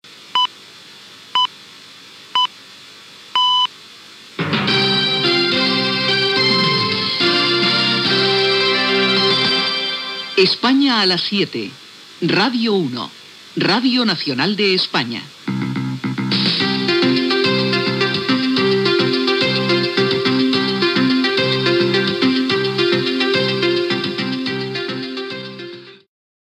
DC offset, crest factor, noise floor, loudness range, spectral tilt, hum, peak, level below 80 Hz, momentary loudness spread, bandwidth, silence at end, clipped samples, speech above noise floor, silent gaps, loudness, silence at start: under 0.1%; 16 dB; -40 dBFS; 5 LU; -5 dB/octave; none; -2 dBFS; -66 dBFS; 9 LU; 13 kHz; 0.6 s; under 0.1%; 23 dB; none; -16 LUFS; 0.05 s